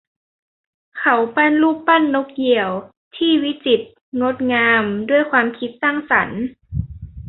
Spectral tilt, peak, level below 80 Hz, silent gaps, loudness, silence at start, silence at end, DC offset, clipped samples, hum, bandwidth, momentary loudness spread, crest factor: -10 dB/octave; -2 dBFS; -44 dBFS; 2.97-3.11 s, 4.01-4.12 s; -17 LUFS; 0.95 s; 0 s; under 0.1%; under 0.1%; none; 4.1 kHz; 13 LU; 18 dB